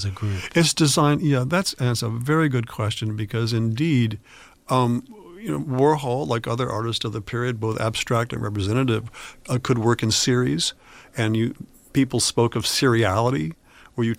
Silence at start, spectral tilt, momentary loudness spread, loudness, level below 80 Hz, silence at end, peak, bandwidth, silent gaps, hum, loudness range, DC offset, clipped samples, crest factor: 0 s; -5 dB/octave; 9 LU; -22 LUFS; -50 dBFS; 0.05 s; -6 dBFS; 16 kHz; none; none; 3 LU; under 0.1%; under 0.1%; 18 dB